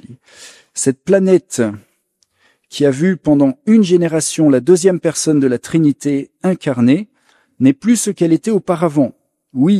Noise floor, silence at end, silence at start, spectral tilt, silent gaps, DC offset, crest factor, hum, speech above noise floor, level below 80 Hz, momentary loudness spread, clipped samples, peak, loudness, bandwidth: -62 dBFS; 0 s; 0.1 s; -6 dB/octave; none; under 0.1%; 14 dB; none; 49 dB; -56 dBFS; 7 LU; under 0.1%; 0 dBFS; -14 LUFS; 14.5 kHz